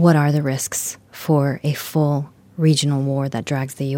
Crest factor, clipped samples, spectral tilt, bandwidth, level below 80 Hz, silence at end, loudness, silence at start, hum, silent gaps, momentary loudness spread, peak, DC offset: 18 dB; under 0.1%; -5.5 dB/octave; 17 kHz; -62 dBFS; 0 s; -20 LUFS; 0 s; none; none; 8 LU; -2 dBFS; under 0.1%